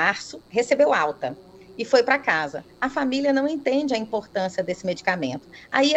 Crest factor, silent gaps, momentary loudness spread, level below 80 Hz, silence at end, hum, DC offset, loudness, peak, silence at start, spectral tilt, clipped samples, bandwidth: 20 dB; none; 13 LU; -62 dBFS; 0 s; none; under 0.1%; -23 LUFS; -4 dBFS; 0 s; -4 dB/octave; under 0.1%; 8.6 kHz